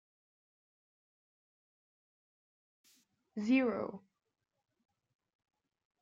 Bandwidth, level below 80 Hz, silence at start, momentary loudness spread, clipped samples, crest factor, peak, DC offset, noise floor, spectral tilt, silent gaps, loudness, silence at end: 7.4 kHz; -84 dBFS; 3.35 s; 18 LU; under 0.1%; 22 dB; -20 dBFS; under 0.1%; -72 dBFS; -6.5 dB/octave; none; -34 LUFS; 2.05 s